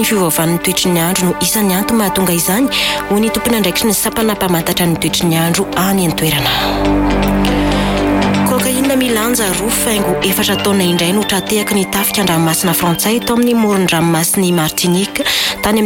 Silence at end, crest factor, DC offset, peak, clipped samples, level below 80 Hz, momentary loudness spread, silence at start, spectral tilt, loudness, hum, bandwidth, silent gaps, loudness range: 0 s; 12 dB; under 0.1%; -2 dBFS; under 0.1%; -30 dBFS; 2 LU; 0 s; -4 dB/octave; -13 LUFS; none; 17 kHz; none; 1 LU